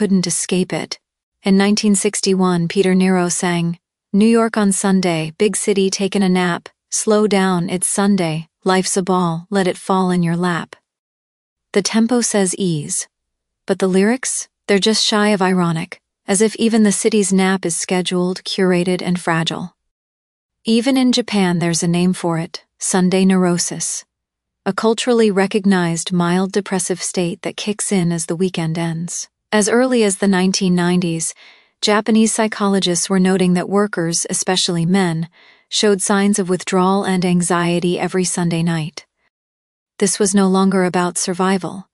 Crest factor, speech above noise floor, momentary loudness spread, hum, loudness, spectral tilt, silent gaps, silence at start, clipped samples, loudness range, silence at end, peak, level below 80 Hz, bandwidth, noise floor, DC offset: 16 dB; 63 dB; 8 LU; none; -17 LUFS; -4.5 dB/octave; 1.23-1.32 s, 10.99-11.56 s, 19.91-20.49 s, 39.30-39.86 s; 0 s; under 0.1%; 3 LU; 0.1 s; 0 dBFS; -60 dBFS; 13.5 kHz; -79 dBFS; under 0.1%